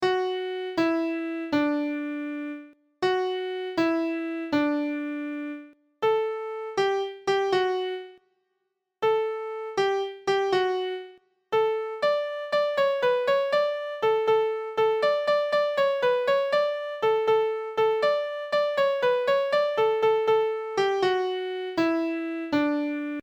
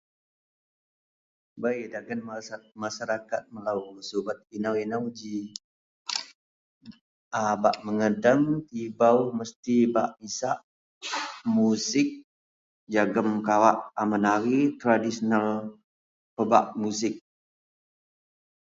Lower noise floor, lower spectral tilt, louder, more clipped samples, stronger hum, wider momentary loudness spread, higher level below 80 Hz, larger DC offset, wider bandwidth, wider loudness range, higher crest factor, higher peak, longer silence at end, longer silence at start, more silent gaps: second, -79 dBFS vs under -90 dBFS; about the same, -5 dB/octave vs -5 dB/octave; about the same, -26 LUFS vs -27 LUFS; neither; neither; second, 8 LU vs 14 LU; about the same, -70 dBFS vs -72 dBFS; neither; first, 19 kHz vs 8 kHz; second, 4 LU vs 9 LU; second, 14 dB vs 24 dB; second, -12 dBFS vs -4 dBFS; second, 0 s vs 1.45 s; second, 0 s vs 1.55 s; second, none vs 5.64-6.05 s, 6.35-6.81 s, 7.01-7.31 s, 9.56-9.63 s, 10.63-11.01 s, 12.24-12.87 s, 15.84-16.37 s